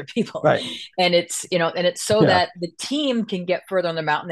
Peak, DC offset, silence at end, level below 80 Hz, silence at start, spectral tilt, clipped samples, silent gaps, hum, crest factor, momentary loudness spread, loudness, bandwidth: -4 dBFS; under 0.1%; 0 s; -64 dBFS; 0 s; -4 dB/octave; under 0.1%; none; none; 18 dB; 8 LU; -21 LUFS; 12.5 kHz